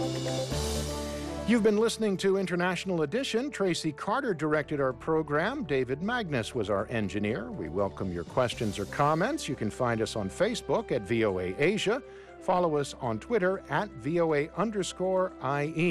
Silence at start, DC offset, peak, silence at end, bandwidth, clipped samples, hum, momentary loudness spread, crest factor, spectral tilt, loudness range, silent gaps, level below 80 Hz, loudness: 0 s; under 0.1%; -16 dBFS; 0 s; 15 kHz; under 0.1%; none; 6 LU; 14 dB; -5.5 dB/octave; 2 LU; none; -50 dBFS; -29 LUFS